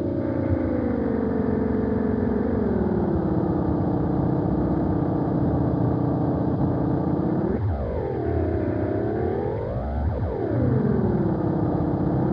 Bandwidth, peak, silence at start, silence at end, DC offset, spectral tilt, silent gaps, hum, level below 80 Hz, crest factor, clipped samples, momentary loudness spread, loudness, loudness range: 5.2 kHz; -10 dBFS; 0 s; 0 s; under 0.1%; -12 dB/octave; none; none; -36 dBFS; 14 dB; under 0.1%; 4 LU; -24 LUFS; 2 LU